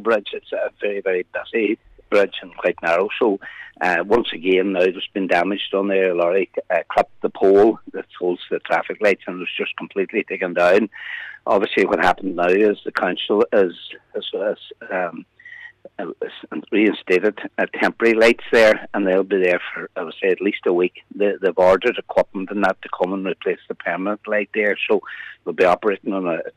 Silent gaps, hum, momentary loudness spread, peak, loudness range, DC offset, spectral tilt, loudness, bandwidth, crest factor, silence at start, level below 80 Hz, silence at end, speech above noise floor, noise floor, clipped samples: none; none; 13 LU; -6 dBFS; 5 LU; under 0.1%; -5.5 dB/octave; -20 LUFS; 12.5 kHz; 14 dB; 0 s; -58 dBFS; 0.05 s; 21 dB; -41 dBFS; under 0.1%